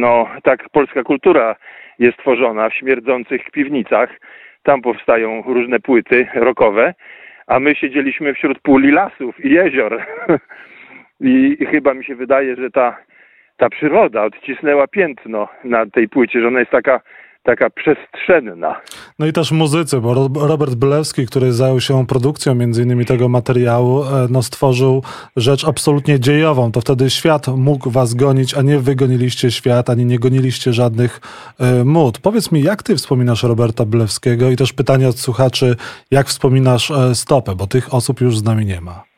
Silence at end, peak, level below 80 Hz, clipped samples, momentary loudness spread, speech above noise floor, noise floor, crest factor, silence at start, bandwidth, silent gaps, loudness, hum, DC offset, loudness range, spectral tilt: 0.15 s; 0 dBFS; -48 dBFS; under 0.1%; 6 LU; 35 dB; -49 dBFS; 14 dB; 0 s; 14.5 kHz; none; -14 LUFS; none; under 0.1%; 2 LU; -6 dB/octave